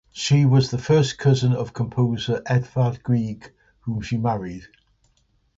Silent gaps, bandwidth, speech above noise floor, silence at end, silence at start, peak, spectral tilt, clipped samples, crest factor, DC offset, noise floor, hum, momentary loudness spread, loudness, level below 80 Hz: none; 7.8 kHz; 44 dB; 0.9 s; 0.15 s; -6 dBFS; -6.5 dB/octave; under 0.1%; 16 dB; under 0.1%; -64 dBFS; none; 13 LU; -22 LUFS; -50 dBFS